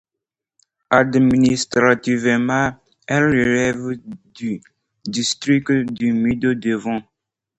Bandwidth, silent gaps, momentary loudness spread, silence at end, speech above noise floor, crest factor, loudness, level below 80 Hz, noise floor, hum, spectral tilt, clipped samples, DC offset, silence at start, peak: 8.8 kHz; none; 13 LU; 0.55 s; 67 dB; 18 dB; -18 LUFS; -50 dBFS; -85 dBFS; none; -5 dB/octave; under 0.1%; under 0.1%; 0.9 s; 0 dBFS